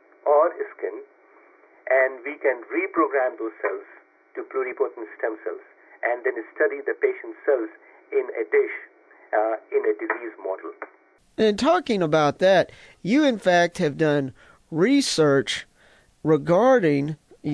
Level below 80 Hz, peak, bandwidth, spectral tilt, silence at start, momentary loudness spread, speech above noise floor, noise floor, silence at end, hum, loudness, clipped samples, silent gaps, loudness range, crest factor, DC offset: -64 dBFS; -8 dBFS; 11 kHz; -5 dB/octave; 0.25 s; 14 LU; 34 dB; -57 dBFS; 0 s; none; -23 LUFS; under 0.1%; none; 6 LU; 14 dB; under 0.1%